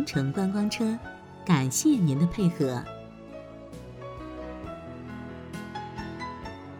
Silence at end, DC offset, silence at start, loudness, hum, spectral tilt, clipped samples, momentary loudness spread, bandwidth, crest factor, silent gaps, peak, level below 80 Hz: 0 s; under 0.1%; 0 s; -28 LUFS; none; -5.5 dB/octave; under 0.1%; 20 LU; 19 kHz; 20 dB; none; -10 dBFS; -52 dBFS